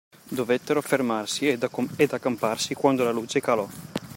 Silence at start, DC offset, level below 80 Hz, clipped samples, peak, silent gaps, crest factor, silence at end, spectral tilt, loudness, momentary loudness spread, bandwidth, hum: 0.25 s; under 0.1%; -68 dBFS; under 0.1%; -6 dBFS; none; 20 dB; 0 s; -4.5 dB/octave; -25 LUFS; 6 LU; 16.5 kHz; none